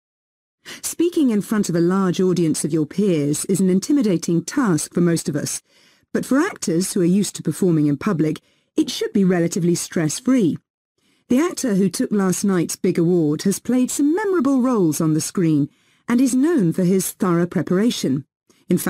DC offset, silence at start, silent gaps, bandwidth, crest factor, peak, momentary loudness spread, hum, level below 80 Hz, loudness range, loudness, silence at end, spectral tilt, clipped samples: under 0.1%; 0.65 s; 10.70-10.95 s, 18.36-18.41 s; 16 kHz; 12 dB; -6 dBFS; 6 LU; none; -62 dBFS; 2 LU; -19 LUFS; 0 s; -5.5 dB/octave; under 0.1%